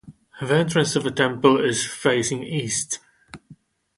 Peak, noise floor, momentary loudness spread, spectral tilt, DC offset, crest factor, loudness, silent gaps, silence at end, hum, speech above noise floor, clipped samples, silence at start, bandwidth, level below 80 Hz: -2 dBFS; -51 dBFS; 9 LU; -4 dB/octave; under 0.1%; 20 dB; -21 LUFS; none; 0.45 s; none; 30 dB; under 0.1%; 0.05 s; 11.5 kHz; -60 dBFS